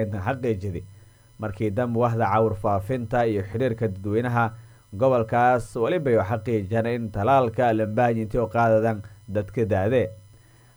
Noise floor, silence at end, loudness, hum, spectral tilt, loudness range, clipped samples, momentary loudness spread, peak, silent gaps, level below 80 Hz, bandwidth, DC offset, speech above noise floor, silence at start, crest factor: -52 dBFS; 0.55 s; -24 LUFS; none; -8 dB/octave; 3 LU; under 0.1%; 9 LU; -8 dBFS; none; -48 dBFS; over 20 kHz; under 0.1%; 29 dB; 0 s; 14 dB